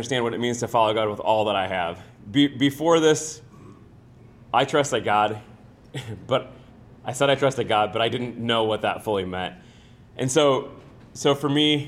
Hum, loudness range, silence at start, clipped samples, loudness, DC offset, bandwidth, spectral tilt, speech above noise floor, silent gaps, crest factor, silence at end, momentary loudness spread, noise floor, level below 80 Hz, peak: none; 4 LU; 0 s; under 0.1%; -23 LUFS; under 0.1%; 15.5 kHz; -4.5 dB/octave; 26 dB; none; 18 dB; 0 s; 16 LU; -49 dBFS; -58 dBFS; -6 dBFS